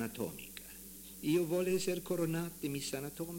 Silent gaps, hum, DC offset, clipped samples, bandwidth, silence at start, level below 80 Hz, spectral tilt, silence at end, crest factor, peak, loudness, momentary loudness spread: none; none; under 0.1%; under 0.1%; 17 kHz; 0 s; -64 dBFS; -5 dB/octave; 0 s; 16 dB; -22 dBFS; -36 LUFS; 15 LU